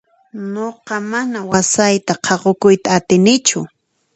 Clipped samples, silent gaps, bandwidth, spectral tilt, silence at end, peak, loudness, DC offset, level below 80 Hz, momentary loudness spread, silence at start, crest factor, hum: under 0.1%; none; 9 kHz; -4 dB/octave; 0.5 s; 0 dBFS; -15 LUFS; under 0.1%; -54 dBFS; 13 LU; 0.35 s; 16 dB; none